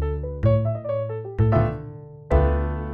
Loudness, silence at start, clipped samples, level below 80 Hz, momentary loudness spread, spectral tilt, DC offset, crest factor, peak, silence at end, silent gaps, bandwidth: -23 LUFS; 0 s; under 0.1%; -28 dBFS; 12 LU; -10.5 dB/octave; under 0.1%; 16 dB; -6 dBFS; 0 s; none; 4.2 kHz